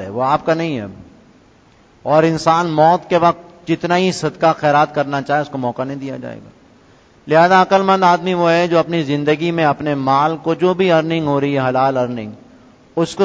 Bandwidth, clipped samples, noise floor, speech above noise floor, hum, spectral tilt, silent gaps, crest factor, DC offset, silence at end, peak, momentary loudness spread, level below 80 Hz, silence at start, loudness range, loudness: 8 kHz; under 0.1%; -49 dBFS; 34 dB; none; -6 dB/octave; none; 16 dB; under 0.1%; 0 s; 0 dBFS; 12 LU; -54 dBFS; 0 s; 4 LU; -15 LUFS